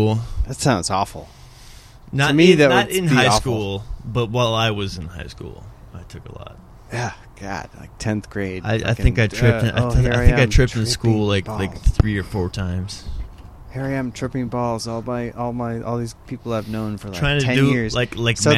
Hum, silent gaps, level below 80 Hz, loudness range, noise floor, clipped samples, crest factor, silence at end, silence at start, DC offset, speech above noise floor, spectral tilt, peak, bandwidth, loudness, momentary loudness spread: none; none; -30 dBFS; 9 LU; -42 dBFS; under 0.1%; 20 dB; 0 s; 0 s; under 0.1%; 23 dB; -5.5 dB/octave; 0 dBFS; 15 kHz; -20 LUFS; 19 LU